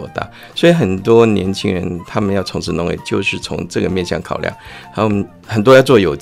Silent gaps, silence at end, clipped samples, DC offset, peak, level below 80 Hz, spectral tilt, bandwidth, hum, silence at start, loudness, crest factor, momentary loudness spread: none; 0 s; under 0.1%; under 0.1%; 0 dBFS; -42 dBFS; -6 dB/octave; 15.5 kHz; none; 0 s; -15 LUFS; 14 dB; 13 LU